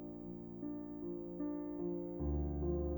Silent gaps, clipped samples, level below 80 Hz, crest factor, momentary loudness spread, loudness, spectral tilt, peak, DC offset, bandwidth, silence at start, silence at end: none; under 0.1%; -48 dBFS; 14 dB; 8 LU; -42 LUFS; -13.5 dB/octave; -26 dBFS; under 0.1%; over 20 kHz; 0 s; 0 s